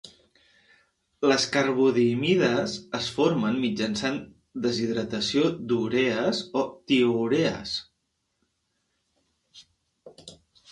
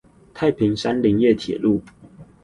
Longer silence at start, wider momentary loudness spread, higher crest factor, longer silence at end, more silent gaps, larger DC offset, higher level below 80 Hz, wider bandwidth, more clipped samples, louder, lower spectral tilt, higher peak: second, 0.05 s vs 0.35 s; first, 8 LU vs 5 LU; about the same, 20 dB vs 16 dB; first, 0.4 s vs 0.2 s; neither; neither; second, -62 dBFS vs -50 dBFS; about the same, 11.5 kHz vs 10.5 kHz; neither; second, -25 LUFS vs -20 LUFS; second, -5 dB/octave vs -7 dB/octave; second, -8 dBFS vs -4 dBFS